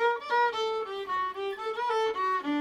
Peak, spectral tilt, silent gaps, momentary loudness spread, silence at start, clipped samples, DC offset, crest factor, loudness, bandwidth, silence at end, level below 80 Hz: -16 dBFS; -3 dB/octave; none; 6 LU; 0 s; under 0.1%; under 0.1%; 14 dB; -29 LUFS; 12 kHz; 0 s; -70 dBFS